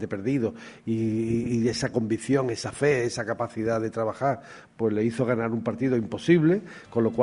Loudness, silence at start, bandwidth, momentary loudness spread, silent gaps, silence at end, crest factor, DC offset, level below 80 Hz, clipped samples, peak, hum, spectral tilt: -26 LUFS; 0 s; 11 kHz; 7 LU; none; 0 s; 18 dB; under 0.1%; -58 dBFS; under 0.1%; -8 dBFS; none; -6.5 dB/octave